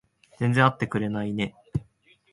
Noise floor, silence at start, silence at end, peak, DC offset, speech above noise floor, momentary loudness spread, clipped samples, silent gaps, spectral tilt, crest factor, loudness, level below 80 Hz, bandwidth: -60 dBFS; 0.4 s; 0.5 s; -4 dBFS; under 0.1%; 36 dB; 13 LU; under 0.1%; none; -7 dB/octave; 22 dB; -26 LUFS; -52 dBFS; 11.5 kHz